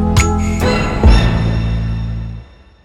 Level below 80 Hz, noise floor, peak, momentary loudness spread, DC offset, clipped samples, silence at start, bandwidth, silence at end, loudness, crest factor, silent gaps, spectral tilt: -18 dBFS; -35 dBFS; 0 dBFS; 14 LU; under 0.1%; under 0.1%; 0 s; 14.5 kHz; 0.4 s; -15 LUFS; 14 dB; none; -6 dB/octave